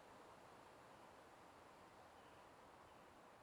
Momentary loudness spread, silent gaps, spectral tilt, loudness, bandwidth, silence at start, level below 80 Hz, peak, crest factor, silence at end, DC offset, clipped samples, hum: 1 LU; none; -4 dB/octave; -64 LUFS; 14.5 kHz; 0 s; -84 dBFS; -52 dBFS; 12 dB; 0 s; under 0.1%; under 0.1%; none